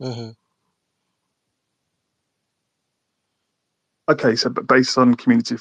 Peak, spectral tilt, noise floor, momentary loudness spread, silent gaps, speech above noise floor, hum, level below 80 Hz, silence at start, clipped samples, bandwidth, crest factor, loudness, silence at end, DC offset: -2 dBFS; -5 dB/octave; -76 dBFS; 16 LU; none; 59 dB; none; -66 dBFS; 0 s; under 0.1%; 9.2 kHz; 20 dB; -17 LUFS; 0 s; under 0.1%